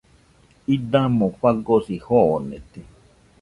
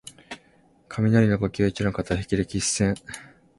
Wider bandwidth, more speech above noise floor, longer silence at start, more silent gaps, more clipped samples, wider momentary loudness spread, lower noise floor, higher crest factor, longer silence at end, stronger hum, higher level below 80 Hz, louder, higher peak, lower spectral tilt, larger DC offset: about the same, 11 kHz vs 11.5 kHz; about the same, 35 dB vs 36 dB; first, 0.7 s vs 0.05 s; neither; neither; second, 14 LU vs 21 LU; second, -55 dBFS vs -59 dBFS; about the same, 18 dB vs 20 dB; first, 0.6 s vs 0.35 s; neither; about the same, -50 dBFS vs -46 dBFS; first, -20 LUFS vs -24 LUFS; about the same, -4 dBFS vs -6 dBFS; first, -9 dB/octave vs -5.5 dB/octave; neither